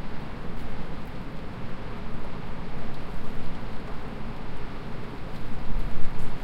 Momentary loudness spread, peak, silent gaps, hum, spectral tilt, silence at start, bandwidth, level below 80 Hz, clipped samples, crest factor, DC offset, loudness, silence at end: 2 LU; -6 dBFS; none; none; -7 dB/octave; 0 s; 5.2 kHz; -34 dBFS; under 0.1%; 16 dB; under 0.1%; -38 LUFS; 0 s